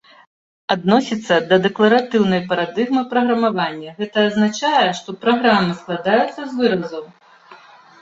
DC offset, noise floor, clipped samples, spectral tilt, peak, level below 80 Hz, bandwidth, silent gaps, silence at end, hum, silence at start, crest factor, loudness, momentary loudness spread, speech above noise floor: under 0.1%; -44 dBFS; under 0.1%; -5.5 dB/octave; -2 dBFS; -60 dBFS; 7.8 kHz; none; 0.45 s; none; 0.7 s; 18 dB; -17 LUFS; 8 LU; 27 dB